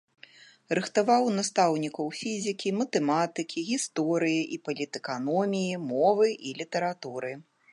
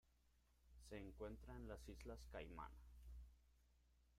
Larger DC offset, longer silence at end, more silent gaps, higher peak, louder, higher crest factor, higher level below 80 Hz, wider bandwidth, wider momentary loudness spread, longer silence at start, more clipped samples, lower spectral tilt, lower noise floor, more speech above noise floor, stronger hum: neither; first, 0.3 s vs 0 s; neither; first, -10 dBFS vs -40 dBFS; first, -28 LUFS vs -58 LUFS; about the same, 18 dB vs 18 dB; second, -80 dBFS vs -64 dBFS; second, 11.5 kHz vs 16 kHz; about the same, 9 LU vs 8 LU; first, 0.7 s vs 0.05 s; neither; second, -4.5 dB/octave vs -6 dB/octave; second, -54 dBFS vs -79 dBFS; first, 27 dB vs 23 dB; second, none vs 60 Hz at -60 dBFS